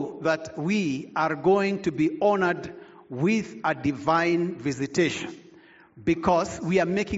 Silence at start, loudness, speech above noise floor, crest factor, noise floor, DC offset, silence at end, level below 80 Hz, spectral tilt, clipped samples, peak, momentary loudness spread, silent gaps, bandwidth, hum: 0 s; -25 LUFS; 28 dB; 18 dB; -53 dBFS; under 0.1%; 0 s; -56 dBFS; -5 dB/octave; under 0.1%; -8 dBFS; 7 LU; none; 8 kHz; none